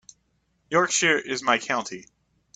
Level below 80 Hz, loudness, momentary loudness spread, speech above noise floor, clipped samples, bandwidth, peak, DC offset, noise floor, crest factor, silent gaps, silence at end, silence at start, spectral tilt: -66 dBFS; -23 LUFS; 13 LU; 46 dB; under 0.1%; 9.4 kHz; -4 dBFS; under 0.1%; -70 dBFS; 22 dB; none; 0.55 s; 0.7 s; -2 dB/octave